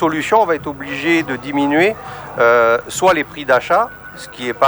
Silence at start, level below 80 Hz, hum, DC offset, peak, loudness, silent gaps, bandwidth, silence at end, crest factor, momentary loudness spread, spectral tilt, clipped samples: 0 s; -50 dBFS; none; under 0.1%; 0 dBFS; -16 LUFS; none; over 20 kHz; 0 s; 16 dB; 12 LU; -4.5 dB/octave; under 0.1%